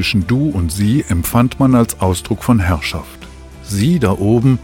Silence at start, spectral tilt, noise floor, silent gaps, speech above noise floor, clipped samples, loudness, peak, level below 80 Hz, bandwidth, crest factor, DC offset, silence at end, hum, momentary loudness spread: 0 s; -6 dB/octave; -34 dBFS; none; 20 dB; under 0.1%; -15 LUFS; -2 dBFS; -32 dBFS; 17 kHz; 14 dB; under 0.1%; 0 s; none; 11 LU